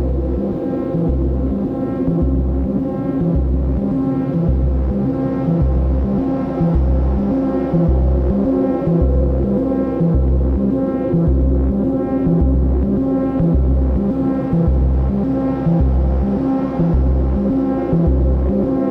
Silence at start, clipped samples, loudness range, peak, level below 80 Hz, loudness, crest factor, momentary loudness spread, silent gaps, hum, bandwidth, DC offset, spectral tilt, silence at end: 0 s; under 0.1%; 2 LU; -2 dBFS; -20 dBFS; -17 LUFS; 12 dB; 3 LU; none; none; 3.1 kHz; under 0.1%; -12 dB/octave; 0 s